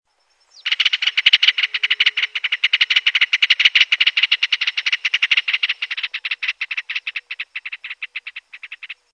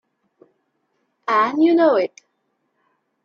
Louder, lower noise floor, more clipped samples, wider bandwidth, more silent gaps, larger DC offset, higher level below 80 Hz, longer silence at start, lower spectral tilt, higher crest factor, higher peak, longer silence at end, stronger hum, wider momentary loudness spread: about the same, -16 LUFS vs -17 LUFS; second, -61 dBFS vs -71 dBFS; neither; first, 9.6 kHz vs 6.8 kHz; neither; neither; about the same, -78 dBFS vs -74 dBFS; second, 0.65 s vs 1.3 s; second, 5.5 dB/octave vs -5.5 dB/octave; about the same, 20 dB vs 18 dB; first, 0 dBFS vs -4 dBFS; second, 0.2 s vs 1.15 s; neither; first, 17 LU vs 12 LU